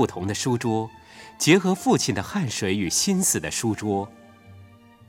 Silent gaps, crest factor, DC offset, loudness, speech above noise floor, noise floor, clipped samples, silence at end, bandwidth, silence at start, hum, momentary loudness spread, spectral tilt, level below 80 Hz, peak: none; 20 dB; under 0.1%; -23 LUFS; 26 dB; -49 dBFS; under 0.1%; 0.45 s; 17.5 kHz; 0 s; none; 9 LU; -4 dB/octave; -56 dBFS; -4 dBFS